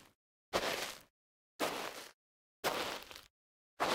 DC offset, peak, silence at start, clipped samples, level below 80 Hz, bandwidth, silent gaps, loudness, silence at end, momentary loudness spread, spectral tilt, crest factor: under 0.1%; -18 dBFS; 0 s; under 0.1%; -70 dBFS; 17 kHz; 0.15-0.52 s, 1.10-1.59 s, 2.14-2.63 s, 3.30-3.77 s; -40 LUFS; 0 s; 16 LU; -2 dB/octave; 24 dB